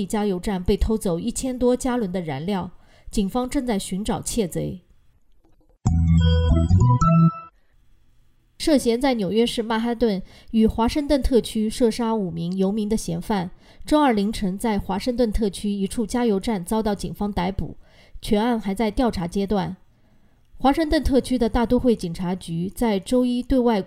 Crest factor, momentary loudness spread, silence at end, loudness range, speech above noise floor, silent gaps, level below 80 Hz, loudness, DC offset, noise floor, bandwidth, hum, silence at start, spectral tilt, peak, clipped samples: 16 dB; 9 LU; 0 s; 4 LU; 35 dB; none; -34 dBFS; -22 LUFS; under 0.1%; -56 dBFS; 15.5 kHz; none; 0 s; -6.5 dB/octave; -6 dBFS; under 0.1%